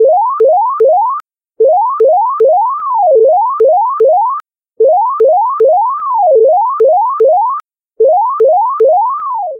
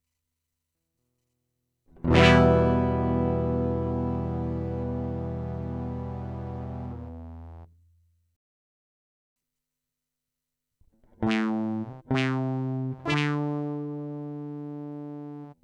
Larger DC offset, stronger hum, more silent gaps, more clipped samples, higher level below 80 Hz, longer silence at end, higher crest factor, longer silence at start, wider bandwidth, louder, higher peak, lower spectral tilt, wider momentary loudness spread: neither; neither; second, none vs 8.36-9.36 s; neither; second, -70 dBFS vs -46 dBFS; about the same, 0 s vs 0.1 s; second, 8 dB vs 24 dB; second, 0 s vs 2 s; second, 2.3 kHz vs 9.6 kHz; first, -10 LUFS vs -27 LUFS; about the same, -2 dBFS vs -4 dBFS; about the same, -6.5 dB/octave vs -7.5 dB/octave; second, 5 LU vs 18 LU